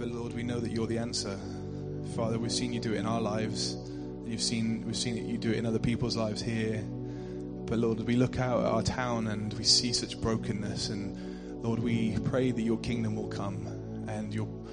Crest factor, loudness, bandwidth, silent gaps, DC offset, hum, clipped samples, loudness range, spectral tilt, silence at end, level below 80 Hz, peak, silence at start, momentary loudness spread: 20 dB; -32 LUFS; 10 kHz; none; under 0.1%; none; under 0.1%; 4 LU; -5 dB/octave; 0 s; -50 dBFS; -12 dBFS; 0 s; 10 LU